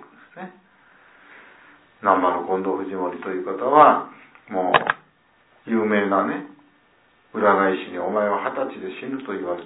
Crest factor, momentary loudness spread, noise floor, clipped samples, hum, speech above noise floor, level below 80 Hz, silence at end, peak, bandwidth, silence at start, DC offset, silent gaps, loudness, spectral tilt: 22 dB; 16 LU; -59 dBFS; under 0.1%; none; 38 dB; -70 dBFS; 0 s; 0 dBFS; 4 kHz; 0 s; under 0.1%; none; -21 LUFS; -9.5 dB/octave